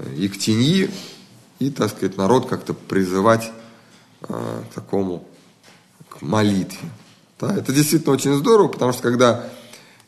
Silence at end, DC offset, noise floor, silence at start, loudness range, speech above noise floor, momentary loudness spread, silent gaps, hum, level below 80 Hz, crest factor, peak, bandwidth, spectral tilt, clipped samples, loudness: 0.3 s; under 0.1%; -51 dBFS; 0 s; 7 LU; 32 dB; 17 LU; none; none; -62 dBFS; 20 dB; -2 dBFS; 13 kHz; -5.5 dB/octave; under 0.1%; -19 LUFS